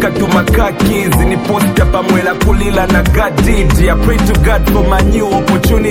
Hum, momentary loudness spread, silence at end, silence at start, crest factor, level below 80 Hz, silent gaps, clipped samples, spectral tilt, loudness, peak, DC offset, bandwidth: none; 2 LU; 0 s; 0 s; 10 dB; -14 dBFS; none; under 0.1%; -6 dB/octave; -11 LUFS; 0 dBFS; under 0.1%; 17 kHz